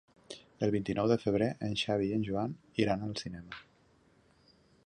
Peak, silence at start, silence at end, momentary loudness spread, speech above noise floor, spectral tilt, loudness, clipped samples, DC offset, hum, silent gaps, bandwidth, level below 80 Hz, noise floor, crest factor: -14 dBFS; 0.3 s; 1.25 s; 19 LU; 34 dB; -6.5 dB/octave; -33 LUFS; under 0.1%; under 0.1%; none; none; 10.5 kHz; -60 dBFS; -66 dBFS; 20 dB